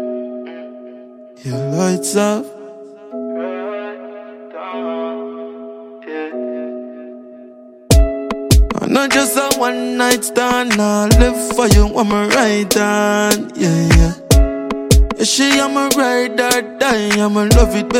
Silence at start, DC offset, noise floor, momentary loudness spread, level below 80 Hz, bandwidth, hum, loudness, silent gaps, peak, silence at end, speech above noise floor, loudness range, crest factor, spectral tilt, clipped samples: 0 s; under 0.1%; -39 dBFS; 19 LU; -20 dBFS; 16.5 kHz; none; -15 LUFS; none; 0 dBFS; 0 s; 25 dB; 13 LU; 16 dB; -4.5 dB/octave; under 0.1%